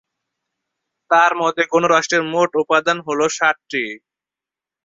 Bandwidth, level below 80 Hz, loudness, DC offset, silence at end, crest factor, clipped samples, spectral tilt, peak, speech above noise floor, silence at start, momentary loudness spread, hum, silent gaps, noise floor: 7.8 kHz; -66 dBFS; -17 LUFS; under 0.1%; 0.9 s; 18 dB; under 0.1%; -3 dB/octave; -2 dBFS; 71 dB; 1.1 s; 9 LU; none; none; -88 dBFS